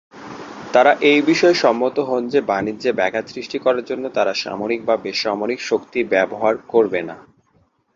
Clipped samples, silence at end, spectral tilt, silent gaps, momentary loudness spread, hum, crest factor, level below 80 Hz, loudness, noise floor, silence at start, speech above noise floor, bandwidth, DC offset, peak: under 0.1%; 0.75 s; -4.5 dB/octave; none; 11 LU; none; 18 dB; -62 dBFS; -18 LUFS; -60 dBFS; 0.15 s; 42 dB; 7.6 kHz; under 0.1%; -2 dBFS